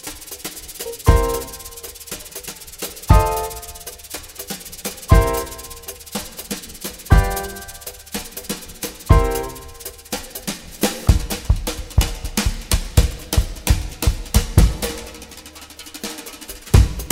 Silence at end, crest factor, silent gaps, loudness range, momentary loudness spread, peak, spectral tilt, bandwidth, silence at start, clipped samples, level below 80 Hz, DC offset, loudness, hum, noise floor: 0 s; 20 dB; none; 3 LU; 16 LU; 0 dBFS; -4.5 dB/octave; 16.5 kHz; 0.05 s; under 0.1%; -24 dBFS; under 0.1%; -22 LUFS; none; -39 dBFS